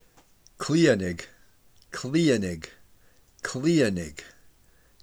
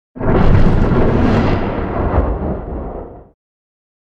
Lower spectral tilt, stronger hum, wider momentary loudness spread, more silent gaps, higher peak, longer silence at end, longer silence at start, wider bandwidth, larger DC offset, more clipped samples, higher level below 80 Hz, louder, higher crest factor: second, -5.5 dB/octave vs -9.5 dB/octave; neither; first, 18 LU vs 13 LU; neither; second, -8 dBFS vs 0 dBFS; about the same, 0.8 s vs 0.8 s; first, 0.6 s vs 0.15 s; first, over 20 kHz vs 6 kHz; neither; neither; second, -60 dBFS vs -18 dBFS; second, -25 LUFS vs -16 LUFS; first, 20 dB vs 14 dB